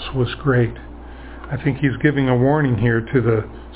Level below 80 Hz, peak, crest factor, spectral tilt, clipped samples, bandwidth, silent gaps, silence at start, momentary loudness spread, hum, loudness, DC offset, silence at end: -38 dBFS; -2 dBFS; 16 dB; -11.5 dB/octave; under 0.1%; 4 kHz; none; 0 s; 20 LU; none; -19 LUFS; under 0.1%; 0 s